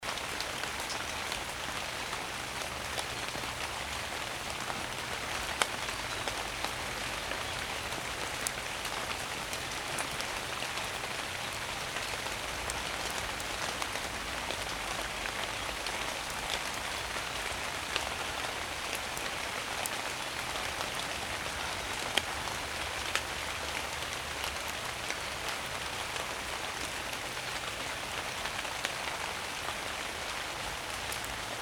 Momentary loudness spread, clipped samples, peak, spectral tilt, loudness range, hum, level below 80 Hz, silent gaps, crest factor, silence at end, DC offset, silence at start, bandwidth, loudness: 2 LU; under 0.1%; -6 dBFS; -1.5 dB/octave; 1 LU; none; -52 dBFS; none; 30 dB; 0 s; under 0.1%; 0 s; over 20 kHz; -35 LUFS